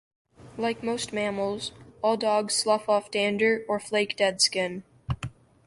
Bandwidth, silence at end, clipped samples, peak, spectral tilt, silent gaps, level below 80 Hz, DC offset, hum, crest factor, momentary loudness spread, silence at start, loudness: 11.5 kHz; 0.4 s; under 0.1%; -8 dBFS; -3 dB/octave; none; -54 dBFS; under 0.1%; none; 20 dB; 12 LU; 0.4 s; -26 LUFS